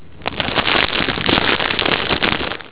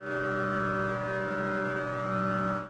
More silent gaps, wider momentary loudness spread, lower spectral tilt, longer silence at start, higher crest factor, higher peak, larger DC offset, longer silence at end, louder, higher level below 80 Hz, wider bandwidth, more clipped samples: neither; first, 6 LU vs 2 LU; about the same, -8 dB/octave vs -7 dB/octave; about the same, 0 s vs 0 s; about the same, 18 dB vs 14 dB; first, 0 dBFS vs -16 dBFS; first, 1% vs under 0.1%; about the same, 0 s vs 0 s; first, -16 LUFS vs -30 LUFS; first, -38 dBFS vs -56 dBFS; second, 4 kHz vs 9.8 kHz; neither